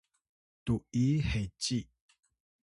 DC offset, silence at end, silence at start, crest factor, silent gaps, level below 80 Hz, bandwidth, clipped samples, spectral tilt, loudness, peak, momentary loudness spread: under 0.1%; 0.8 s; 0.65 s; 16 dB; none; -48 dBFS; 11.5 kHz; under 0.1%; -5.5 dB/octave; -33 LUFS; -18 dBFS; 7 LU